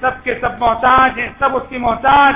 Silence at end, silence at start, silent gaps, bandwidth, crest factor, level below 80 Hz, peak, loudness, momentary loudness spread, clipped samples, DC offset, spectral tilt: 0 s; 0 s; none; 3.9 kHz; 12 dB; -36 dBFS; -2 dBFS; -14 LUFS; 8 LU; under 0.1%; under 0.1%; -8 dB/octave